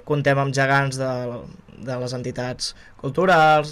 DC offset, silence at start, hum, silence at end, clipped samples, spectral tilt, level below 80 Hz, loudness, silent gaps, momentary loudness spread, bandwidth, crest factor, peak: under 0.1%; 0.05 s; none; 0 s; under 0.1%; -5.5 dB/octave; -52 dBFS; -21 LUFS; none; 16 LU; 13 kHz; 12 dB; -8 dBFS